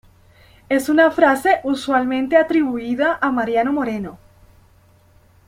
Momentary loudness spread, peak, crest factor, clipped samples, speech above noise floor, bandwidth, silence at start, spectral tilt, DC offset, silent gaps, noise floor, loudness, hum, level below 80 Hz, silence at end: 8 LU; -2 dBFS; 18 dB; under 0.1%; 35 dB; 16 kHz; 0.7 s; -5 dB/octave; under 0.1%; none; -52 dBFS; -18 LUFS; none; -54 dBFS; 1.3 s